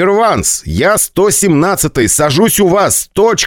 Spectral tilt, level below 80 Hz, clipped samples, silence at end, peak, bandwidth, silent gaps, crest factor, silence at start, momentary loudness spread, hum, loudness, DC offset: -3.5 dB/octave; -34 dBFS; under 0.1%; 0 s; 0 dBFS; 19 kHz; none; 10 dB; 0 s; 3 LU; none; -10 LUFS; under 0.1%